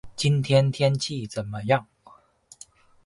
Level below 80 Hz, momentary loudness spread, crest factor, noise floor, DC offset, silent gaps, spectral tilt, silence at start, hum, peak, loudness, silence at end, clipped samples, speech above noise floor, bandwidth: -56 dBFS; 11 LU; 20 dB; -55 dBFS; under 0.1%; none; -5.5 dB/octave; 0.05 s; none; -6 dBFS; -24 LUFS; 1.2 s; under 0.1%; 32 dB; 11.5 kHz